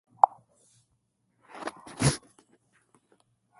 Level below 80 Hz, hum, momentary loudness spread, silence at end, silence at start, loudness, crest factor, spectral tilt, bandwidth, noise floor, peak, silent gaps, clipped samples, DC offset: -56 dBFS; none; 15 LU; 1.4 s; 0.25 s; -29 LUFS; 32 dB; -4.5 dB/octave; 12 kHz; -74 dBFS; 0 dBFS; none; under 0.1%; under 0.1%